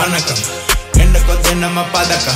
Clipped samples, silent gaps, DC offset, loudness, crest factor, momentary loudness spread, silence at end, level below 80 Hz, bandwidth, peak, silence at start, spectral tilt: under 0.1%; none; under 0.1%; -14 LUFS; 12 dB; 4 LU; 0 s; -16 dBFS; 16.5 kHz; 0 dBFS; 0 s; -3.5 dB/octave